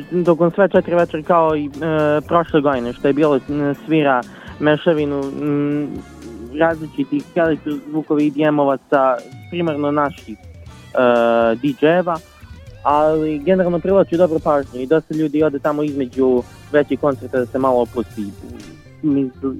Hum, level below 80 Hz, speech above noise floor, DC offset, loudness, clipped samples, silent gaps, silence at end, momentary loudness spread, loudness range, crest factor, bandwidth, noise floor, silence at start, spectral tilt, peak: none; -46 dBFS; 21 dB; under 0.1%; -17 LUFS; under 0.1%; none; 0 s; 9 LU; 3 LU; 16 dB; 13.5 kHz; -38 dBFS; 0 s; -7.5 dB/octave; 0 dBFS